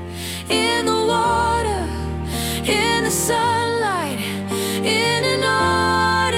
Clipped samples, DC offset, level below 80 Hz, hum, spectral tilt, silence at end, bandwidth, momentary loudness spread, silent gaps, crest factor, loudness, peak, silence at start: under 0.1%; under 0.1%; -40 dBFS; none; -3.5 dB/octave; 0 s; 16.5 kHz; 7 LU; none; 14 dB; -19 LUFS; -6 dBFS; 0 s